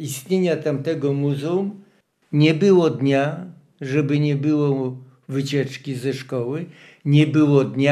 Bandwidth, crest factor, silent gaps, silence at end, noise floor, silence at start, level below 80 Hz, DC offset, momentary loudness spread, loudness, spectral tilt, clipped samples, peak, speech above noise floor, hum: 13.5 kHz; 18 dB; none; 0 s; -54 dBFS; 0 s; -72 dBFS; under 0.1%; 14 LU; -20 LUFS; -7 dB/octave; under 0.1%; -2 dBFS; 35 dB; none